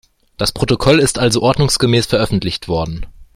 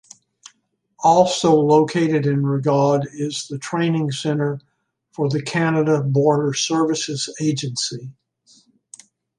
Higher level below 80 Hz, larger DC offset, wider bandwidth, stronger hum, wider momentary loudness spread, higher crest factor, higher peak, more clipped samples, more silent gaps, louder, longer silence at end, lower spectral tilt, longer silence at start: first, -34 dBFS vs -62 dBFS; neither; first, 16 kHz vs 11.5 kHz; neither; about the same, 8 LU vs 10 LU; about the same, 14 dB vs 18 dB; about the same, 0 dBFS vs -2 dBFS; neither; neither; first, -15 LUFS vs -19 LUFS; second, 0.1 s vs 1.25 s; about the same, -4.5 dB/octave vs -5.5 dB/octave; second, 0.4 s vs 1 s